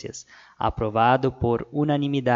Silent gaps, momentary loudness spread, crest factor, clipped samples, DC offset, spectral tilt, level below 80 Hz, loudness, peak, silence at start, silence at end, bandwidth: none; 10 LU; 18 dB; under 0.1%; under 0.1%; -6.5 dB/octave; -44 dBFS; -23 LUFS; -6 dBFS; 0.05 s; 0 s; 7.6 kHz